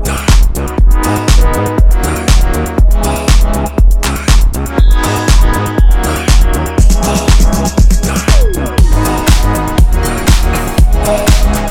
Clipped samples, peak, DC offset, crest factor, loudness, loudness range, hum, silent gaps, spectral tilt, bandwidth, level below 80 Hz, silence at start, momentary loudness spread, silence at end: under 0.1%; 0 dBFS; under 0.1%; 8 dB; -11 LUFS; 1 LU; none; none; -5 dB/octave; 16.5 kHz; -10 dBFS; 0 s; 2 LU; 0 s